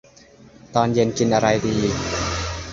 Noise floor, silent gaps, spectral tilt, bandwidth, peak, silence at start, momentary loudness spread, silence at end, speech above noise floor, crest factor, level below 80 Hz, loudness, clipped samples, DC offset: -48 dBFS; none; -5 dB/octave; 7.8 kHz; -2 dBFS; 0.65 s; 6 LU; 0 s; 29 dB; 18 dB; -38 dBFS; -21 LUFS; under 0.1%; under 0.1%